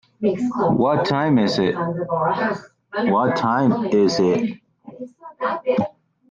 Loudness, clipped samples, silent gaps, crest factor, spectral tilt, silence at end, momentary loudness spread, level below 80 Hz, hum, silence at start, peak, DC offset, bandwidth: -20 LUFS; under 0.1%; none; 14 dB; -6.5 dB/octave; 0.4 s; 13 LU; -58 dBFS; none; 0.2 s; -6 dBFS; under 0.1%; 7.6 kHz